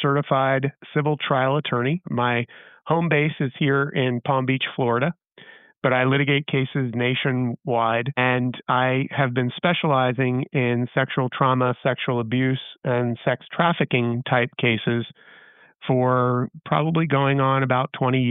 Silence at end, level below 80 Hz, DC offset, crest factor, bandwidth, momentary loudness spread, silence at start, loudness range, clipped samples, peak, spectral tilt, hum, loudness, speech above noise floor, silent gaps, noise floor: 0 s; -66 dBFS; under 0.1%; 16 dB; 4 kHz; 5 LU; 0 s; 1 LU; under 0.1%; -6 dBFS; -5 dB/octave; none; -22 LUFS; 27 dB; 5.78-5.82 s; -49 dBFS